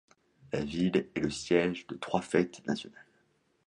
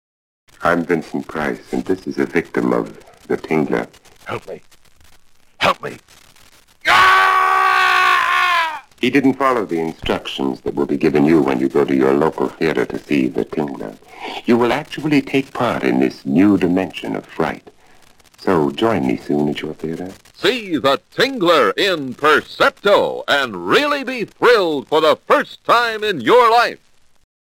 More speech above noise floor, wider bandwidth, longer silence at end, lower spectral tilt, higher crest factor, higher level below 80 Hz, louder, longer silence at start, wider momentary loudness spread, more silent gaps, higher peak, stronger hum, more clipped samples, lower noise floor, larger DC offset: first, 40 dB vs 31 dB; second, 11 kHz vs 17 kHz; about the same, 0.65 s vs 0.7 s; about the same, -5.5 dB/octave vs -5 dB/octave; about the same, 20 dB vs 16 dB; second, -60 dBFS vs -50 dBFS; second, -32 LUFS vs -16 LUFS; about the same, 0.5 s vs 0.6 s; second, 9 LU vs 13 LU; neither; second, -12 dBFS vs -2 dBFS; neither; neither; first, -71 dBFS vs -48 dBFS; neither